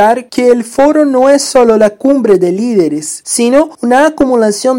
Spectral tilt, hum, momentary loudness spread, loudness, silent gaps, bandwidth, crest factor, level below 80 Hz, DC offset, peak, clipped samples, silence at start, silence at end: -4 dB/octave; none; 4 LU; -9 LUFS; none; 16.5 kHz; 8 dB; -46 dBFS; under 0.1%; 0 dBFS; 2%; 0 s; 0 s